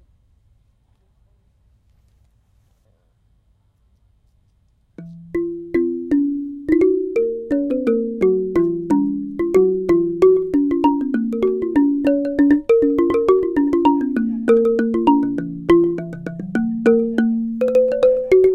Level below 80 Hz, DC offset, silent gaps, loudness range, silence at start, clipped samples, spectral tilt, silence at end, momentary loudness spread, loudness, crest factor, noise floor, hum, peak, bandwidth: -48 dBFS; under 0.1%; none; 8 LU; 5 s; under 0.1%; -8.5 dB/octave; 0 s; 8 LU; -18 LUFS; 16 dB; -60 dBFS; none; -2 dBFS; 8.4 kHz